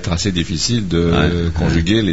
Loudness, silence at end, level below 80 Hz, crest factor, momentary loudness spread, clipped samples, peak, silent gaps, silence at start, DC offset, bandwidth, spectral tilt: -16 LUFS; 0 s; -28 dBFS; 14 dB; 3 LU; under 0.1%; -2 dBFS; none; 0 s; 2%; 8 kHz; -5 dB/octave